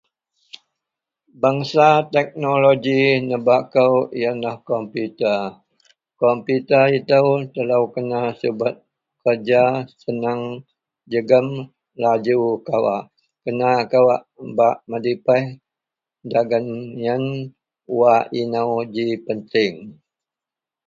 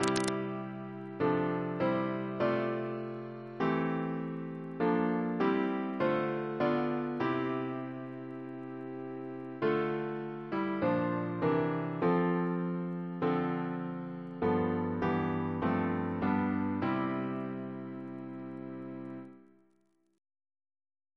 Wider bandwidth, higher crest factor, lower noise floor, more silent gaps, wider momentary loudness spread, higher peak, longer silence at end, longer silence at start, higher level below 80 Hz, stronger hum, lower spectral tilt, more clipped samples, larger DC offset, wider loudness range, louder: second, 7.4 kHz vs 11 kHz; about the same, 20 dB vs 24 dB; first, -88 dBFS vs -73 dBFS; neither; about the same, 12 LU vs 12 LU; first, 0 dBFS vs -10 dBFS; second, 0.95 s vs 1.75 s; first, 1.4 s vs 0 s; about the same, -66 dBFS vs -68 dBFS; neither; about the same, -7 dB/octave vs -7 dB/octave; neither; neither; about the same, 4 LU vs 5 LU; first, -19 LUFS vs -34 LUFS